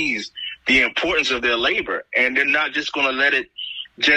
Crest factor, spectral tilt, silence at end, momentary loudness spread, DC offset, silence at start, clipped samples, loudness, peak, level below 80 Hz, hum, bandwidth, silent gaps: 14 dB; -2 dB/octave; 0 s; 11 LU; under 0.1%; 0 s; under 0.1%; -18 LUFS; -6 dBFS; -50 dBFS; none; 12.5 kHz; none